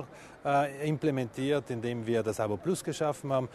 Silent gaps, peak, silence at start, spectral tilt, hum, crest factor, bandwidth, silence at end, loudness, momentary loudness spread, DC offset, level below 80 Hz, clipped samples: none; -16 dBFS; 0 s; -6 dB/octave; none; 16 dB; 13.5 kHz; 0 s; -31 LUFS; 5 LU; under 0.1%; -64 dBFS; under 0.1%